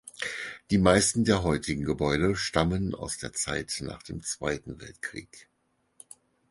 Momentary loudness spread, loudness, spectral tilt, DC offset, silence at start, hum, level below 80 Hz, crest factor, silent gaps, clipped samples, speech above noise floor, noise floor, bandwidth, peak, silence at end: 16 LU; -28 LUFS; -4.5 dB/octave; under 0.1%; 0.05 s; none; -46 dBFS; 24 dB; none; under 0.1%; 46 dB; -73 dBFS; 11.5 kHz; -6 dBFS; 1.1 s